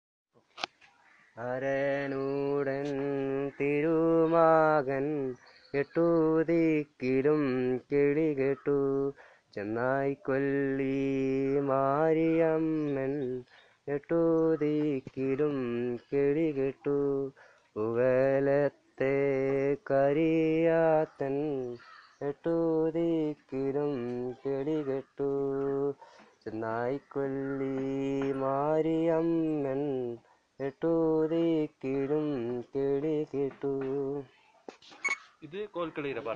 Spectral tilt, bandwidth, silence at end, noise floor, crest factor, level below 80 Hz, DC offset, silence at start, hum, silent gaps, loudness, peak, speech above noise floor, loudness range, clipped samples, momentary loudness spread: -8 dB/octave; 7.2 kHz; 0 s; -62 dBFS; 20 dB; -64 dBFS; under 0.1%; 0.55 s; none; none; -30 LUFS; -10 dBFS; 33 dB; 6 LU; under 0.1%; 11 LU